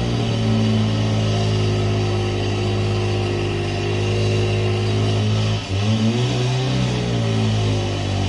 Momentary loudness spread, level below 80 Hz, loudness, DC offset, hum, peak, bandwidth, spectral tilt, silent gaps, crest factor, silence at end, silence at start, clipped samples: 3 LU; -36 dBFS; -20 LUFS; under 0.1%; none; -6 dBFS; 11 kHz; -6 dB/octave; none; 12 dB; 0 s; 0 s; under 0.1%